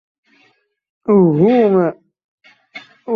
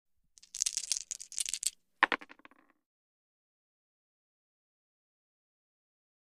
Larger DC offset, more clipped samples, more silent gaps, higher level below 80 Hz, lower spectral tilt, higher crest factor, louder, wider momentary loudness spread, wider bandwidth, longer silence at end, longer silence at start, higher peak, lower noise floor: neither; neither; first, 2.24-2.38 s vs none; first, -62 dBFS vs -76 dBFS; first, -10.5 dB/octave vs 2 dB/octave; second, 14 dB vs 34 dB; first, -13 LUFS vs -33 LUFS; first, 25 LU vs 9 LU; second, 5 kHz vs 15.5 kHz; second, 0 s vs 3.95 s; first, 1.1 s vs 0.55 s; first, -2 dBFS vs -8 dBFS; second, -58 dBFS vs -63 dBFS